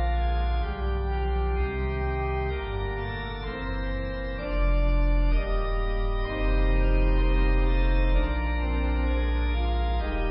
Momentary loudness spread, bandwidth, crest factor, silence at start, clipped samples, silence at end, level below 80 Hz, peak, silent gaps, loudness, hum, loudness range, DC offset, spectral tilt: 6 LU; 5.6 kHz; 12 dB; 0 s; under 0.1%; 0 s; -26 dBFS; -14 dBFS; none; -28 LUFS; none; 4 LU; under 0.1%; -11 dB/octave